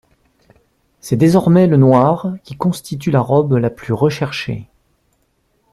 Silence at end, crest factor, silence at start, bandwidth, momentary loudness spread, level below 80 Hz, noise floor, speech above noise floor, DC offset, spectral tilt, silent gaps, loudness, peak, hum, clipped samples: 1.1 s; 14 dB; 1.05 s; 13.5 kHz; 13 LU; -50 dBFS; -62 dBFS; 49 dB; under 0.1%; -7.5 dB/octave; none; -15 LUFS; -2 dBFS; none; under 0.1%